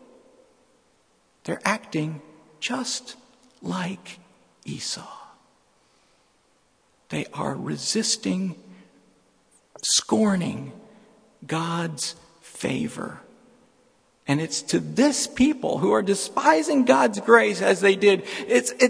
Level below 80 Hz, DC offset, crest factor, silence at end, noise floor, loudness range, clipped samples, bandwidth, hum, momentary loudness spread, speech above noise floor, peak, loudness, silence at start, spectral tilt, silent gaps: -62 dBFS; under 0.1%; 24 dB; 0 s; -64 dBFS; 15 LU; under 0.1%; 11 kHz; none; 19 LU; 41 dB; 0 dBFS; -23 LUFS; 1.45 s; -4 dB/octave; none